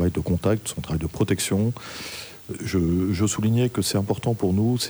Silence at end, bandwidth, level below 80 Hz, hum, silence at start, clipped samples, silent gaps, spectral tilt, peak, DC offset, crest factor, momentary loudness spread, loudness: 0 s; over 20 kHz; -44 dBFS; none; 0 s; under 0.1%; none; -5.5 dB/octave; -8 dBFS; under 0.1%; 16 dB; 11 LU; -24 LUFS